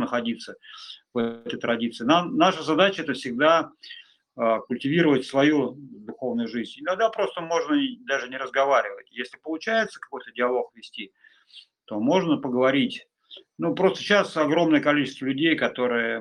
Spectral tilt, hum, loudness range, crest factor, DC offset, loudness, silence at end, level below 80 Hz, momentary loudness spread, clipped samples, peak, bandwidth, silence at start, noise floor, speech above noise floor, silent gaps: -5.5 dB/octave; none; 4 LU; 20 dB; under 0.1%; -24 LUFS; 0 s; -70 dBFS; 16 LU; under 0.1%; -4 dBFS; 10.5 kHz; 0 s; -52 dBFS; 28 dB; none